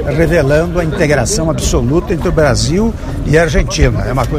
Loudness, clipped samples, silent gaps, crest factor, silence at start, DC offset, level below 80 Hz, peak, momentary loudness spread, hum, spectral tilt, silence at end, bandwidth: -13 LUFS; under 0.1%; none; 12 dB; 0 s; under 0.1%; -20 dBFS; 0 dBFS; 4 LU; none; -5.5 dB/octave; 0 s; 16 kHz